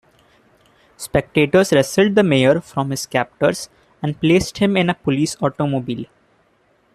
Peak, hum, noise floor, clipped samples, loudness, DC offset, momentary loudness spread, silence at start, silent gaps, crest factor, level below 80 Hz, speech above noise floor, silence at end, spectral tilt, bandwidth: -2 dBFS; none; -59 dBFS; under 0.1%; -18 LUFS; under 0.1%; 13 LU; 1 s; none; 16 dB; -48 dBFS; 42 dB; 0.9 s; -5.5 dB/octave; 14.5 kHz